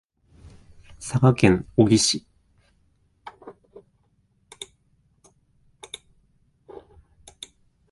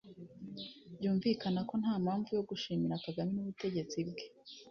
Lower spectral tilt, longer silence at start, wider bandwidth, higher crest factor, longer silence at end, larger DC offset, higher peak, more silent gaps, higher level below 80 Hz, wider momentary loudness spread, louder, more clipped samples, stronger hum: about the same, -5 dB/octave vs -6 dB/octave; first, 1 s vs 0.05 s; first, 11.5 kHz vs 6.8 kHz; first, 26 dB vs 16 dB; first, 4.4 s vs 0 s; neither; first, 0 dBFS vs -20 dBFS; neither; first, -50 dBFS vs -72 dBFS; first, 28 LU vs 15 LU; first, -20 LUFS vs -37 LUFS; neither; neither